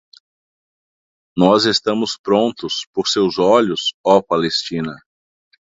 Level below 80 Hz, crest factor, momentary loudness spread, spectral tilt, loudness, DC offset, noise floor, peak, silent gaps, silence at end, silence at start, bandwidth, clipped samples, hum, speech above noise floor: -56 dBFS; 18 dB; 10 LU; -4.5 dB/octave; -17 LUFS; under 0.1%; under -90 dBFS; 0 dBFS; 2.19-2.24 s, 2.87-2.93 s, 3.94-4.04 s; 0.8 s; 1.35 s; 8 kHz; under 0.1%; none; over 74 dB